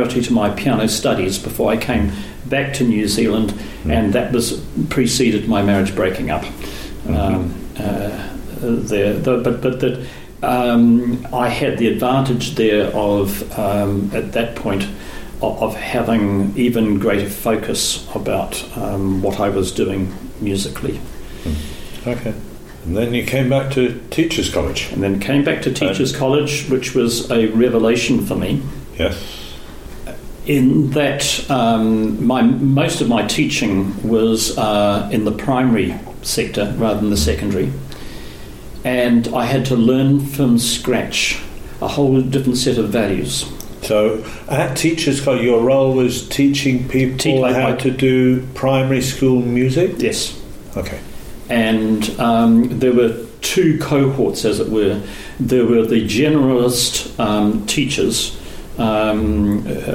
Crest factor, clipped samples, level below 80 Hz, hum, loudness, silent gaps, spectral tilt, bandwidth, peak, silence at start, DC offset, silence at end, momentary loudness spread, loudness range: 14 dB; under 0.1%; -34 dBFS; none; -17 LUFS; none; -5 dB/octave; 17 kHz; -4 dBFS; 0 s; under 0.1%; 0 s; 12 LU; 5 LU